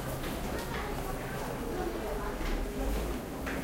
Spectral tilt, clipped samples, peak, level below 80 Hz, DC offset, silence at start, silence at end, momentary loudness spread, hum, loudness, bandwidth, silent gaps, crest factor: -5 dB/octave; under 0.1%; -22 dBFS; -38 dBFS; under 0.1%; 0 s; 0 s; 2 LU; none; -36 LUFS; 16 kHz; none; 14 dB